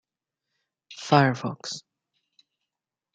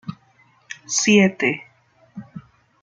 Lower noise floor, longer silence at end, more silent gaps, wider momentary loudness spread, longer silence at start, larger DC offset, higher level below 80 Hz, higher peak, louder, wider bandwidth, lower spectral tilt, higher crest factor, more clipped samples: first, -87 dBFS vs -57 dBFS; first, 1.35 s vs 0.45 s; neither; second, 19 LU vs 26 LU; first, 0.9 s vs 0.05 s; neither; second, -74 dBFS vs -64 dBFS; about the same, -4 dBFS vs -2 dBFS; second, -24 LUFS vs -18 LUFS; about the same, 9 kHz vs 9.4 kHz; first, -5.5 dB/octave vs -3.5 dB/octave; about the same, 24 dB vs 20 dB; neither